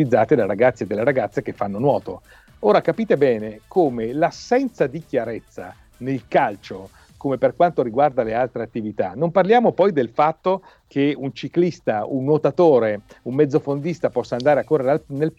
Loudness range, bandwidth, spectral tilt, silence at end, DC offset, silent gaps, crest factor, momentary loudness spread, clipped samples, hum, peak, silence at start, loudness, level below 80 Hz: 4 LU; 8.4 kHz; -7.5 dB/octave; 0.1 s; under 0.1%; none; 16 dB; 11 LU; under 0.1%; none; -4 dBFS; 0 s; -20 LUFS; -56 dBFS